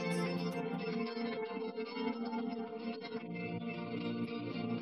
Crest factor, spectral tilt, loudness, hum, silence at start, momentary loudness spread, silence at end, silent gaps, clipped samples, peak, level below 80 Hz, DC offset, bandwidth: 14 dB; -6.5 dB/octave; -40 LUFS; none; 0 s; 5 LU; 0 s; none; under 0.1%; -24 dBFS; -86 dBFS; under 0.1%; 13.5 kHz